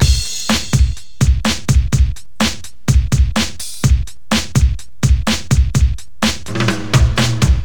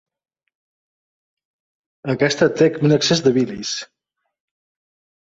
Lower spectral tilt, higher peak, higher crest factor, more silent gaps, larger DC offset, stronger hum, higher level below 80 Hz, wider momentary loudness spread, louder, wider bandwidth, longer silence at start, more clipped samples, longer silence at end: about the same, -4.5 dB/octave vs -5 dB/octave; about the same, 0 dBFS vs -2 dBFS; second, 14 dB vs 20 dB; neither; first, 6% vs under 0.1%; neither; first, -18 dBFS vs -60 dBFS; second, 5 LU vs 11 LU; about the same, -16 LUFS vs -18 LUFS; first, 19 kHz vs 8 kHz; second, 0 s vs 2.05 s; neither; second, 0 s vs 1.35 s